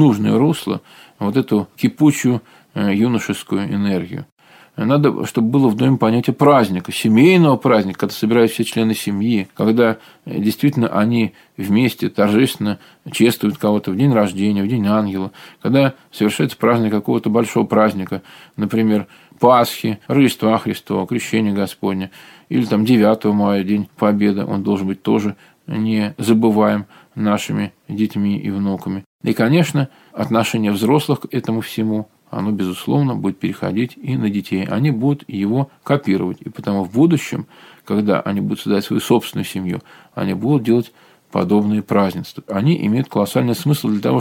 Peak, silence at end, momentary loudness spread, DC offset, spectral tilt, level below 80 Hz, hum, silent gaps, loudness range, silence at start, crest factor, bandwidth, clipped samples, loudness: 0 dBFS; 0 s; 10 LU; under 0.1%; -6.5 dB/octave; -60 dBFS; none; 4.32-4.37 s, 29.06-29.19 s; 5 LU; 0 s; 16 dB; 17 kHz; under 0.1%; -17 LUFS